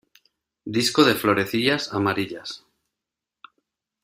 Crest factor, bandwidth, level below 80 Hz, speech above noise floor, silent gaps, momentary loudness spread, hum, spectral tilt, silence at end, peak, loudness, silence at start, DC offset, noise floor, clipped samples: 22 dB; 16 kHz; -62 dBFS; 64 dB; none; 18 LU; none; -4 dB/octave; 1.45 s; -2 dBFS; -21 LUFS; 0.65 s; under 0.1%; -86 dBFS; under 0.1%